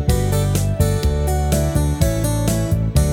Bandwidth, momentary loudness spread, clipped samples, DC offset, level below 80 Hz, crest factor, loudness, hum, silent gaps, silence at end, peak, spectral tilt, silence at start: 18 kHz; 1 LU; under 0.1%; under 0.1%; -22 dBFS; 14 dB; -19 LUFS; none; none; 0 s; -2 dBFS; -6 dB/octave; 0 s